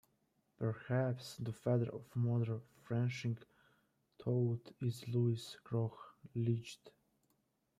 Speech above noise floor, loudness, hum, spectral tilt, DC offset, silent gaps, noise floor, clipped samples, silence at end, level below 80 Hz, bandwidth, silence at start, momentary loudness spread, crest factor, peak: 42 dB; -39 LUFS; none; -7.5 dB/octave; under 0.1%; none; -80 dBFS; under 0.1%; 0.9 s; -76 dBFS; 13 kHz; 0.6 s; 10 LU; 16 dB; -24 dBFS